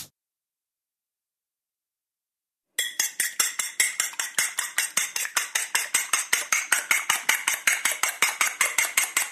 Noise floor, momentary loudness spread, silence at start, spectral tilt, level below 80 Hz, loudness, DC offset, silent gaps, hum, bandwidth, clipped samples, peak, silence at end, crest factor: under -90 dBFS; 4 LU; 0 s; 3 dB/octave; -84 dBFS; -23 LUFS; under 0.1%; none; none; 14 kHz; under 0.1%; -4 dBFS; 0 s; 24 dB